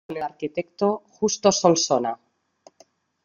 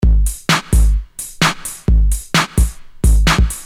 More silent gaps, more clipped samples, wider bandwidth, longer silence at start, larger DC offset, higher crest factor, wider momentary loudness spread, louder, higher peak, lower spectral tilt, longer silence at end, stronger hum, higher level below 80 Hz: neither; neither; second, 10 kHz vs 15 kHz; about the same, 0.1 s vs 0 s; neither; first, 22 dB vs 12 dB; first, 12 LU vs 7 LU; second, -23 LUFS vs -16 LUFS; about the same, -4 dBFS vs -2 dBFS; about the same, -3.5 dB/octave vs -4 dB/octave; first, 1.1 s vs 0 s; neither; second, -66 dBFS vs -16 dBFS